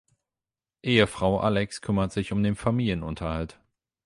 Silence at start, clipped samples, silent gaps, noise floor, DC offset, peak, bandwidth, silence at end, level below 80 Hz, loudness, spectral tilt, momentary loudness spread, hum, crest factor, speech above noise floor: 0.85 s; under 0.1%; none; under -90 dBFS; under 0.1%; -6 dBFS; 11.5 kHz; 0.6 s; -44 dBFS; -26 LUFS; -6 dB/octave; 10 LU; none; 20 dB; over 65 dB